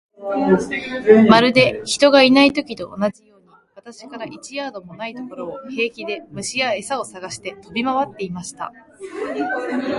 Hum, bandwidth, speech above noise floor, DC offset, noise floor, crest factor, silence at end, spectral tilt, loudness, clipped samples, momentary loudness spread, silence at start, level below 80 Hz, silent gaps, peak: none; 11.5 kHz; 30 dB; under 0.1%; -49 dBFS; 18 dB; 0 s; -4.5 dB/octave; -17 LUFS; under 0.1%; 19 LU; 0.2 s; -56 dBFS; none; 0 dBFS